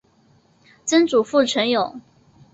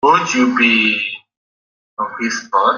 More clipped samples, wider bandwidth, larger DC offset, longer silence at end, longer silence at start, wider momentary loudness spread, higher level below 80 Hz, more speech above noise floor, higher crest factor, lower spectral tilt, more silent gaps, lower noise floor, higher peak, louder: neither; first, 8.2 kHz vs 7.4 kHz; neither; first, 0.55 s vs 0 s; first, 0.85 s vs 0.05 s; second, 10 LU vs 14 LU; about the same, -64 dBFS vs -62 dBFS; second, 39 dB vs over 75 dB; about the same, 16 dB vs 16 dB; about the same, -3 dB/octave vs -3 dB/octave; second, none vs 1.37-1.97 s; second, -57 dBFS vs under -90 dBFS; second, -4 dBFS vs 0 dBFS; second, -19 LUFS vs -15 LUFS